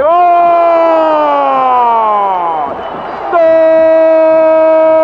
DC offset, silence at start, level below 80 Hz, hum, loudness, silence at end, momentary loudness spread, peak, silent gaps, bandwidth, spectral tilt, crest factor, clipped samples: under 0.1%; 0 s; -48 dBFS; none; -8 LUFS; 0 s; 9 LU; 0 dBFS; none; 5.4 kHz; -6.5 dB/octave; 8 dB; under 0.1%